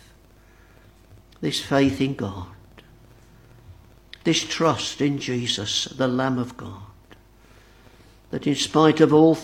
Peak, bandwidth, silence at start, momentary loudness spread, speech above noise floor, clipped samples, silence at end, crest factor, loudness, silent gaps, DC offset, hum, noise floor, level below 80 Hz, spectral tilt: -2 dBFS; 15.5 kHz; 1.4 s; 18 LU; 31 dB; under 0.1%; 0 s; 22 dB; -22 LUFS; none; under 0.1%; none; -52 dBFS; -54 dBFS; -5 dB/octave